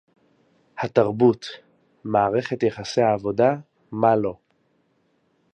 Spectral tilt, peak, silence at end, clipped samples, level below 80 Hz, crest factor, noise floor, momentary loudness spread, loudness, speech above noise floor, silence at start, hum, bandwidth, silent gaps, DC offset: -6.5 dB/octave; -2 dBFS; 1.2 s; under 0.1%; -60 dBFS; 20 dB; -66 dBFS; 16 LU; -22 LUFS; 46 dB; 0.75 s; none; 8.8 kHz; none; under 0.1%